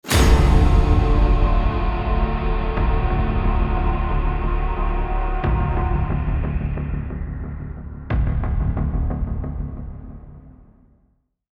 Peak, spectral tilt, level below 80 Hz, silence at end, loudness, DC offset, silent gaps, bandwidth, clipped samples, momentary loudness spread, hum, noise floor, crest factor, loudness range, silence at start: -4 dBFS; -6.5 dB/octave; -20 dBFS; 1.05 s; -22 LUFS; under 0.1%; none; 13.5 kHz; under 0.1%; 14 LU; none; -64 dBFS; 16 dB; 6 LU; 0.05 s